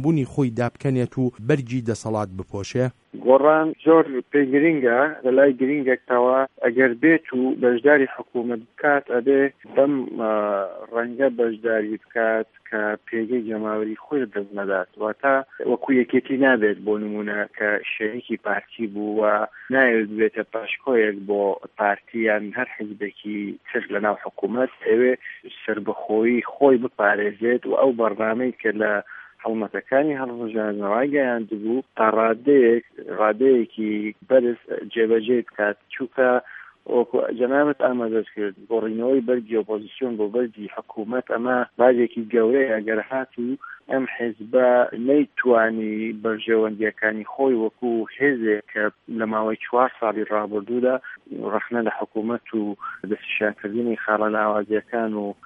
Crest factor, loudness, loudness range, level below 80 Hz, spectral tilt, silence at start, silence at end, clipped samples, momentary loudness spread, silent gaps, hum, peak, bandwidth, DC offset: 20 dB; -22 LUFS; 6 LU; -68 dBFS; -7.5 dB/octave; 0 s; 0.1 s; under 0.1%; 10 LU; none; none; -2 dBFS; 9.4 kHz; under 0.1%